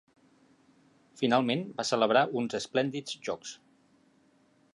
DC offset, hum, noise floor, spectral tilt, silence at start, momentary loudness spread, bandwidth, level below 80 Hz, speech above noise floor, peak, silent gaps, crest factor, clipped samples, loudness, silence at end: under 0.1%; none; -66 dBFS; -4.5 dB/octave; 1.15 s; 13 LU; 11.5 kHz; -76 dBFS; 37 dB; -10 dBFS; none; 22 dB; under 0.1%; -29 LUFS; 1.2 s